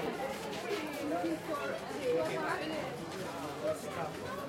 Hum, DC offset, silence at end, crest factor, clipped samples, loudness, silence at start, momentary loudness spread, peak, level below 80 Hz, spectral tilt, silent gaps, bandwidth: none; under 0.1%; 0 s; 14 dB; under 0.1%; -37 LUFS; 0 s; 6 LU; -22 dBFS; -68 dBFS; -4.5 dB/octave; none; 16.5 kHz